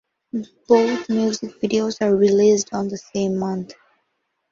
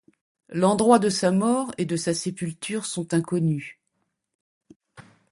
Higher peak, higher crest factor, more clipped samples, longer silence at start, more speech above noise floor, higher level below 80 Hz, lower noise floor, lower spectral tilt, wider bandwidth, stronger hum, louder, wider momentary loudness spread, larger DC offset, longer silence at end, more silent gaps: about the same, -2 dBFS vs -4 dBFS; about the same, 18 dB vs 22 dB; neither; second, 0.35 s vs 0.5 s; about the same, 54 dB vs 53 dB; about the same, -62 dBFS vs -64 dBFS; about the same, -73 dBFS vs -76 dBFS; about the same, -5.5 dB/octave vs -5.5 dB/octave; second, 7.6 kHz vs 11.5 kHz; neither; first, -20 LUFS vs -24 LUFS; about the same, 14 LU vs 13 LU; neither; first, 0.8 s vs 0.3 s; second, none vs 4.35-4.61 s, 4.76-4.80 s